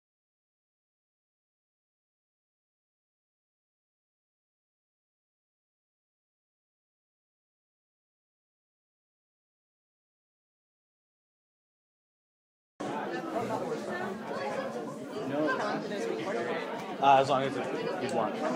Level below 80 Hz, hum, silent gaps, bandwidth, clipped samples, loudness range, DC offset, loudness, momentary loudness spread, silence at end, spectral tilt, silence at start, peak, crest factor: -80 dBFS; none; none; 16 kHz; under 0.1%; 12 LU; under 0.1%; -32 LUFS; 13 LU; 0 s; -5 dB/octave; 12.8 s; -10 dBFS; 26 dB